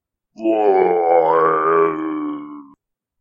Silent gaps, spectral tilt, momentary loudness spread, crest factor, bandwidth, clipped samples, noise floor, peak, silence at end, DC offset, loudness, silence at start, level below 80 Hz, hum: none; -8.5 dB/octave; 12 LU; 16 dB; 5.2 kHz; under 0.1%; -56 dBFS; -2 dBFS; 0.6 s; under 0.1%; -17 LUFS; 0.4 s; -66 dBFS; none